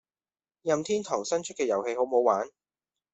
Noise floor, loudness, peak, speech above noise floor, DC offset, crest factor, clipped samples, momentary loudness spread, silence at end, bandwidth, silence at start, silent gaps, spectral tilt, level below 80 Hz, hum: under -90 dBFS; -28 LUFS; -10 dBFS; over 63 dB; under 0.1%; 20 dB; under 0.1%; 6 LU; 0.65 s; 8.2 kHz; 0.65 s; none; -4 dB/octave; -74 dBFS; none